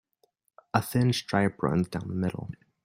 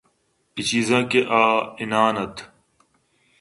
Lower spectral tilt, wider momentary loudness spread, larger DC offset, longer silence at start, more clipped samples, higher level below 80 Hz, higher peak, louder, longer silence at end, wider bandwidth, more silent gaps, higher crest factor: first, -6 dB/octave vs -4 dB/octave; second, 7 LU vs 14 LU; neither; first, 0.75 s vs 0.55 s; neither; about the same, -58 dBFS vs -60 dBFS; second, -6 dBFS vs -2 dBFS; second, -28 LUFS vs -20 LUFS; second, 0.3 s vs 0.95 s; first, 16 kHz vs 11.5 kHz; neither; about the same, 22 dB vs 22 dB